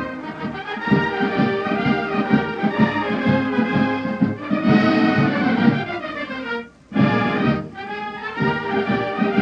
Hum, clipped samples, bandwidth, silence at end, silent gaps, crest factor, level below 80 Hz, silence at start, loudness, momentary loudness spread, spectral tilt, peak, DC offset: none; under 0.1%; 7 kHz; 0 s; none; 16 dB; -50 dBFS; 0 s; -20 LUFS; 11 LU; -8 dB/octave; -4 dBFS; under 0.1%